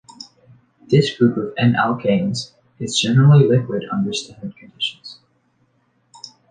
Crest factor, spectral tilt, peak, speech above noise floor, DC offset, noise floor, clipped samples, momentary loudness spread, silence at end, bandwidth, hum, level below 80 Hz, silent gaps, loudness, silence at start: 16 dB; -6 dB/octave; -2 dBFS; 46 dB; under 0.1%; -63 dBFS; under 0.1%; 26 LU; 0.25 s; 9.6 kHz; none; -56 dBFS; none; -17 LUFS; 0.2 s